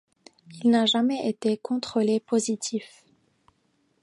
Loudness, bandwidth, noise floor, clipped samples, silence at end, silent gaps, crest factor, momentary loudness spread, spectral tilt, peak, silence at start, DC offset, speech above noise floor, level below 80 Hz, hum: -25 LUFS; 11.5 kHz; -69 dBFS; under 0.1%; 1.15 s; none; 16 dB; 8 LU; -4 dB/octave; -10 dBFS; 0.5 s; under 0.1%; 45 dB; -74 dBFS; none